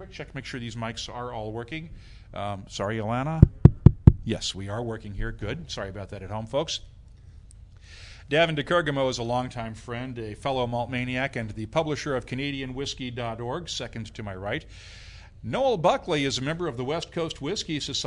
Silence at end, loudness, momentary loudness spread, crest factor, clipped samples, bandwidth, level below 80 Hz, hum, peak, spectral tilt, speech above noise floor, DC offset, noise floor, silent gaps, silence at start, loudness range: 0 s; -27 LUFS; 16 LU; 26 dB; under 0.1%; 11 kHz; -38 dBFS; none; 0 dBFS; -6 dB/octave; 19 dB; under 0.1%; -48 dBFS; none; 0 s; 11 LU